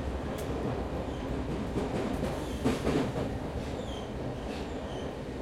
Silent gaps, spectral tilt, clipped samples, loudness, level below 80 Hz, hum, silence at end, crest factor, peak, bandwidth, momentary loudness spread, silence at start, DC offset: none; -6.5 dB/octave; under 0.1%; -34 LUFS; -42 dBFS; none; 0 s; 18 dB; -14 dBFS; 16.5 kHz; 7 LU; 0 s; under 0.1%